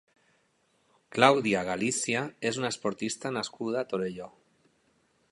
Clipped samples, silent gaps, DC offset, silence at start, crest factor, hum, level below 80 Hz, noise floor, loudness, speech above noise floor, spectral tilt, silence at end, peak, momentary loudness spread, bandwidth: under 0.1%; none; under 0.1%; 1.1 s; 28 dB; none; -70 dBFS; -70 dBFS; -29 LUFS; 42 dB; -3.5 dB/octave; 1.05 s; -2 dBFS; 13 LU; 11.5 kHz